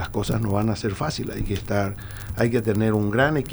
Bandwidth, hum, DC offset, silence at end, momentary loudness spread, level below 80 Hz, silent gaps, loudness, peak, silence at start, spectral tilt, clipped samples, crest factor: over 20 kHz; none; under 0.1%; 0 s; 8 LU; -38 dBFS; none; -24 LUFS; -6 dBFS; 0 s; -6.5 dB/octave; under 0.1%; 16 dB